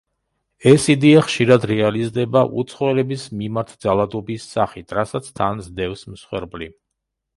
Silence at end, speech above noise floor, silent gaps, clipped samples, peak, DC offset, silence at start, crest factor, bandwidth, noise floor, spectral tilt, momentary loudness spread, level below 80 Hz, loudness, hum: 0.7 s; 60 dB; none; under 0.1%; 0 dBFS; under 0.1%; 0.65 s; 18 dB; 11.5 kHz; -79 dBFS; -6 dB/octave; 16 LU; -50 dBFS; -18 LUFS; none